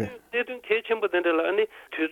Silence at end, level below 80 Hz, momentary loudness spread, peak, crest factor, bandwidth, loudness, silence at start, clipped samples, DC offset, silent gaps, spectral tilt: 0 s; -66 dBFS; 6 LU; -10 dBFS; 16 dB; 14 kHz; -26 LUFS; 0 s; under 0.1%; under 0.1%; none; -6 dB/octave